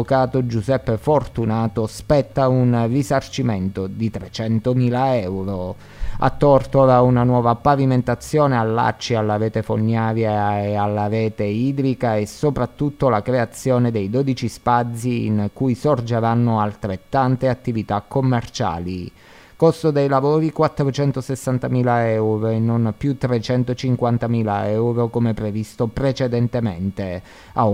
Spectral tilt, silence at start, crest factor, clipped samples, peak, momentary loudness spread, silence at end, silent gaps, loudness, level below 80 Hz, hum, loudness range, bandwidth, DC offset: -7.5 dB/octave; 0 s; 18 dB; under 0.1%; -2 dBFS; 8 LU; 0 s; none; -19 LUFS; -42 dBFS; none; 4 LU; 15 kHz; under 0.1%